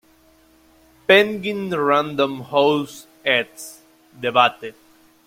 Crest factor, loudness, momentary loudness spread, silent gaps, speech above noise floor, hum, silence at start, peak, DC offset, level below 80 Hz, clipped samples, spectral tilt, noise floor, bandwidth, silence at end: 20 dB; -19 LUFS; 20 LU; none; 35 dB; none; 1.1 s; -2 dBFS; under 0.1%; -64 dBFS; under 0.1%; -4.5 dB/octave; -55 dBFS; 16.5 kHz; 0.55 s